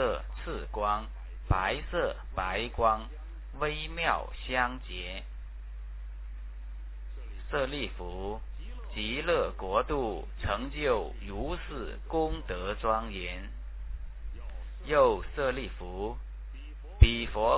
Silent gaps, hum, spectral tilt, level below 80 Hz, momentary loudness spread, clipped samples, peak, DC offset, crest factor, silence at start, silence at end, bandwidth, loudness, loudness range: none; none; -4 dB/octave; -36 dBFS; 16 LU; under 0.1%; -4 dBFS; under 0.1%; 28 dB; 0 s; 0 s; 4 kHz; -32 LUFS; 7 LU